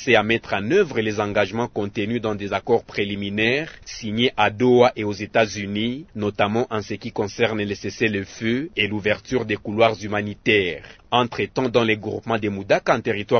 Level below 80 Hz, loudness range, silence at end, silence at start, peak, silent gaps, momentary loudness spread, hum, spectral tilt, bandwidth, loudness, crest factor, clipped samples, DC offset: -52 dBFS; 3 LU; 0 s; 0 s; -2 dBFS; none; 8 LU; none; -5.5 dB/octave; 6.6 kHz; -22 LUFS; 20 dB; under 0.1%; under 0.1%